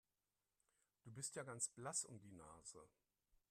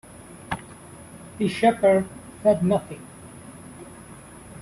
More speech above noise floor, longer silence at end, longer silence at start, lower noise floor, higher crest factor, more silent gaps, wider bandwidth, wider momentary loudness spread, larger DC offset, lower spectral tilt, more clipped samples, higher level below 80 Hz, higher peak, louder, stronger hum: first, over 38 dB vs 23 dB; first, 0.65 s vs 0 s; first, 1.05 s vs 0.2 s; first, under -90 dBFS vs -44 dBFS; about the same, 24 dB vs 20 dB; neither; first, 14.5 kHz vs 12.5 kHz; second, 15 LU vs 23 LU; neither; second, -2.5 dB/octave vs -6.5 dB/octave; neither; second, -84 dBFS vs -56 dBFS; second, -30 dBFS vs -6 dBFS; second, -49 LUFS vs -23 LUFS; neither